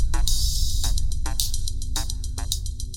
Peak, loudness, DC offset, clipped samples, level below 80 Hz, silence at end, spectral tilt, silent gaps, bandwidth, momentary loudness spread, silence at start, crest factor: -4 dBFS; -27 LUFS; under 0.1%; under 0.1%; -24 dBFS; 0 s; -2 dB/octave; none; 17 kHz; 6 LU; 0 s; 18 dB